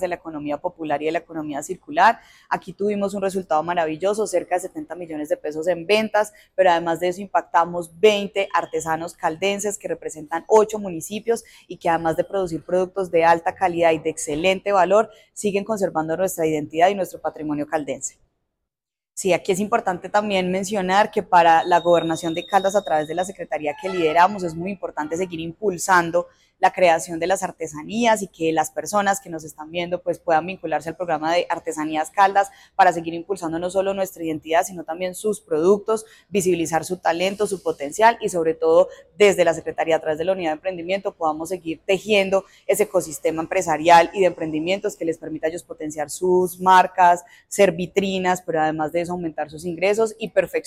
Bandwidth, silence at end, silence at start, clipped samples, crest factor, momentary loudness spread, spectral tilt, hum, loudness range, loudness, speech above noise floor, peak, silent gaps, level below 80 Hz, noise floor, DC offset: 16 kHz; 0.05 s; 0 s; under 0.1%; 18 dB; 11 LU; -4 dB/octave; none; 4 LU; -21 LUFS; 68 dB; -4 dBFS; none; -58 dBFS; -89 dBFS; under 0.1%